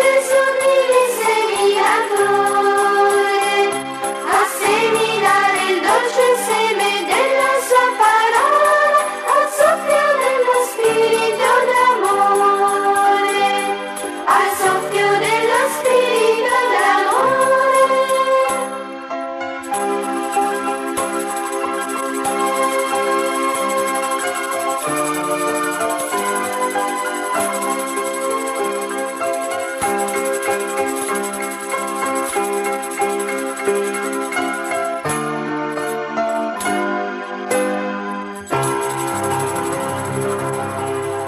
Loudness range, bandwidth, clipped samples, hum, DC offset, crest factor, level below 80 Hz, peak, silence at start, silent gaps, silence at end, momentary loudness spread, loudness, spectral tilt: 7 LU; 15.5 kHz; under 0.1%; none; under 0.1%; 14 dB; -60 dBFS; -2 dBFS; 0 s; none; 0 s; 8 LU; -17 LUFS; -3 dB/octave